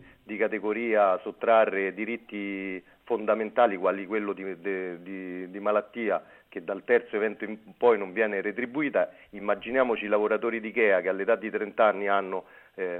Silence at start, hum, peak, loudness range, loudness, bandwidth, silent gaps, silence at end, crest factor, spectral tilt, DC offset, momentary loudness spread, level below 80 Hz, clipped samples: 0 s; none; -8 dBFS; 4 LU; -27 LUFS; 4.1 kHz; none; 0 s; 18 dB; -8 dB/octave; under 0.1%; 13 LU; -72 dBFS; under 0.1%